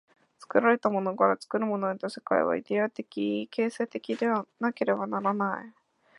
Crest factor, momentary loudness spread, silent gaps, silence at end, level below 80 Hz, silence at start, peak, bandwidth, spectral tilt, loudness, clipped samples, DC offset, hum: 22 dB; 7 LU; none; 0.5 s; -78 dBFS; 0.4 s; -8 dBFS; 11.5 kHz; -6.5 dB/octave; -28 LUFS; under 0.1%; under 0.1%; none